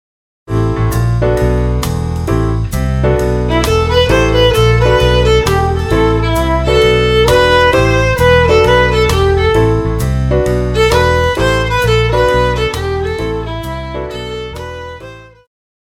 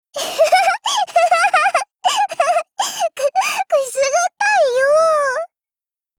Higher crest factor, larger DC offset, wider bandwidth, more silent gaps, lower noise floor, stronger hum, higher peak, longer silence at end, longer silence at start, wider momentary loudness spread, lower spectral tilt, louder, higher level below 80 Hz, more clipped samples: about the same, 12 dB vs 14 dB; neither; second, 16.5 kHz vs over 20 kHz; neither; second, -33 dBFS vs under -90 dBFS; neither; first, 0 dBFS vs -4 dBFS; about the same, 0.7 s vs 0.7 s; first, 0.5 s vs 0.15 s; first, 12 LU vs 7 LU; first, -5.5 dB/octave vs 1.5 dB/octave; first, -12 LUFS vs -16 LUFS; first, -20 dBFS vs -66 dBFS; neither